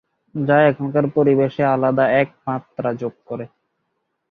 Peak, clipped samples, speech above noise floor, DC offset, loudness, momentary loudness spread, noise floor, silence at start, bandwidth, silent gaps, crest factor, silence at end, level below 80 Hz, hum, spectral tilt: -2 dBFS; under 0.1%; 55 dB; under 0.1%; -18 LUFS; 16 LU; -73 dBFS; 0.35 s; 5 kHz; none; 18 dB; 0.85 s; -60 dBFS; none; -9.5 dB/octave